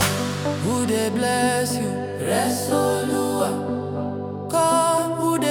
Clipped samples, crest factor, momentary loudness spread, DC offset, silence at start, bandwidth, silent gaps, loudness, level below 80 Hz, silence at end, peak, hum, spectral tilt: under 0.1%; 16 dB; 8 LU; under 0.1%; 0 s; 19 kHz; none; -22 LUFS; -58 dBFS; 0 s; -6 dBFS; 50 Hz at -55 dBFS; -4.5 dB/octave